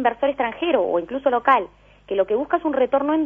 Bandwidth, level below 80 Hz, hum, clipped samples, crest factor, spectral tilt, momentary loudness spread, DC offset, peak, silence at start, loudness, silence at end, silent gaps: 3.7 kHz; -54 dBFS; 50 Hz at -55 dBFS; under 0.1%; 18 dB; -7 dB/octave; 5 LU; under 0.1%; -2 dBFS; 0 s; -21 LUFS; 0 s; none